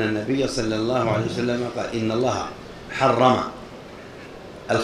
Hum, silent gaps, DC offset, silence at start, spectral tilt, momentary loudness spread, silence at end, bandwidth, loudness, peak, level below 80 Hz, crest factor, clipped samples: none; none; under 0.1%; 0 s; -5.5 dB/octave; 21 LU; 0 s; 14 kHz; -23 LUFS; -2 dBFS; -48 dBFS; 20 dB; under 0.1%